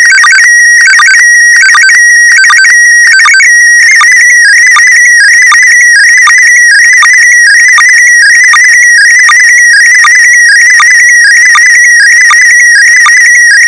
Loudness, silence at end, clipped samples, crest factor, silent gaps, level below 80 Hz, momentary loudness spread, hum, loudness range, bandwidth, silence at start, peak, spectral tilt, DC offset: 1 LUFS; 0 s; 3%; 2 dB; none; -54 dBFS; 0 LU; none; 0 LU; 10.5 kHz; 0 s; 0 dBFS; 6 dB/octave; 0.2%